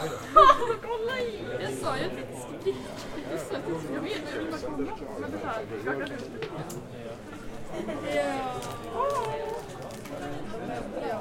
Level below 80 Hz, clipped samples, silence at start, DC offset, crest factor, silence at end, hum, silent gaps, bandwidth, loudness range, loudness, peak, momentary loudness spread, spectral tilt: -50 dBFS; under 0.1%; 0 s; under 0.1%; 26 dB; 0 s; none; none; 16.5 kHz; 7 LU; -29 LUFS; -4 dBFS; 12 LU; -5 dB/octave